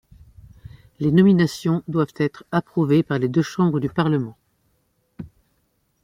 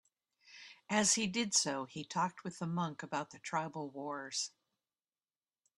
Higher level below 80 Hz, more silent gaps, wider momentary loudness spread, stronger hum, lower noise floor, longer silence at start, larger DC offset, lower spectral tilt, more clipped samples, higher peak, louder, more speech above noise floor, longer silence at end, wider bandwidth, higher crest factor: first, -54 dBFS vs -78 dBFS; neither; first, 18 LU vs 13 LU; neither; second, -68 dBFS vs under -90 dBFS; first, 1 s vs 0.5 s; neither; first, -7.5 dB/octave vs -2.5 dB/octave; neither; first, -4 dBFS vs -16 dBFS; first, -20 LUFS vs -36 LUFS; second, 48 dB vs over 53 dB; second, 0.75 s vs 1.3 s; first, 15 kHz vs 12 kHz; second, 18 dB vs 24 dB